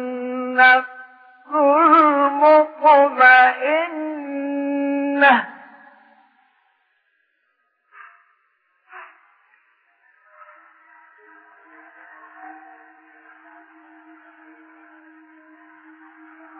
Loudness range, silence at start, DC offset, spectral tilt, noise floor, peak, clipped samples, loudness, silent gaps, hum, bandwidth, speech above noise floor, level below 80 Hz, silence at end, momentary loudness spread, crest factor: 8 LU; 0 s; under 0.1%; -5.5 dB/octave; -69 dBFS; -2 dBFS; under 0.1%; -15 LUFS; none; none; 5.2 kHz; 55 dB; -78 dBFS; 4.1 s; 16 LU; 20 dB